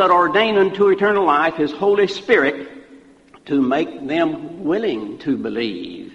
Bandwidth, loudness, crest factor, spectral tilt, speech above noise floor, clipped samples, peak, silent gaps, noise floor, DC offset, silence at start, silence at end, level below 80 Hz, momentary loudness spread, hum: 8 kHz; -18 LUFS; 16 dB; -6 dB/octave; 29 dB; under 0.1%; -2 dBFS; none; -47 dBFS; under 0.1%; 0 s; 0 s; -58 dBFS; 10 LU; none